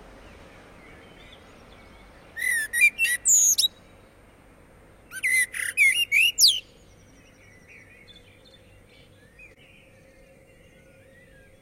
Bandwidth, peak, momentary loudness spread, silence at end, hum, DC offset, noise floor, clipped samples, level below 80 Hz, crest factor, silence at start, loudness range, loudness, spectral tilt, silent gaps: 16 kHz; -6 dBFS; 12 LU; 5 s; none; under 0.1%; -54 dBFS; under 0.1%; -58 dBFS; 22 dB; 0.25 s; 4 LU; -19 LUFS; 2.5 dB/octave; none